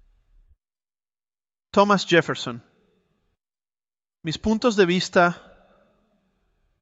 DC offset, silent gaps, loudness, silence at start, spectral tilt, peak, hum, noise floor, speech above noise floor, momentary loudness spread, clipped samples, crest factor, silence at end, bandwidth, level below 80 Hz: under 0.1%; none; -21 LUFS; 1.75 s; -5 dB/octave; -4 dBFS; none; under -90 dBFS; over 70 dB; 15 LU; under 0.1%; 22 dB; 1.45 s; 8.2 kHz; -54 dBFS